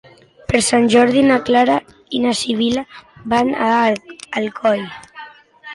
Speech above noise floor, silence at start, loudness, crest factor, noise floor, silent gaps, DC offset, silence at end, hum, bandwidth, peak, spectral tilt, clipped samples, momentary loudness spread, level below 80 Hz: 23 dB; 0.5 s; -16 LUFS; 14 dB; -39 dBFS; none; under 0.1%; 0 s; none; 11.5 kHz; -2 dBFS; -4 dB/octave; under 0.1%; 21 LU; -48 dBFS